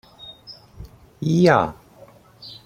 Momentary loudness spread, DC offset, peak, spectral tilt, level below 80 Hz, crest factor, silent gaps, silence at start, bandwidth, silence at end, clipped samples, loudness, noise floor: 26 LU; under 0.1%; -2 dBFS; -7 dB/octave; -50 dBFS; 22 dB; none; 0.25 s; 14.5 kHz; 0.1 s; under 0.1%; -19 LUFS; -48 dBFS